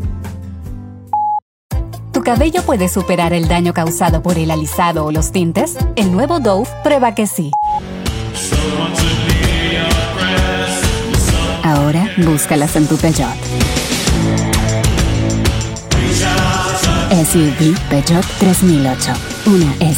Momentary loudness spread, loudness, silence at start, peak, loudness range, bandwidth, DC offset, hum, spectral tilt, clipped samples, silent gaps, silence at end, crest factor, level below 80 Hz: 8 LU; -14 LUFS; 0 s; 0 dBFS; 3 LU; 17 kHz; under 0.1%; none; -5 dB/octave; under 0.1%; 1.42-1.69 s; 0 s; 14 dB; -24 dBFS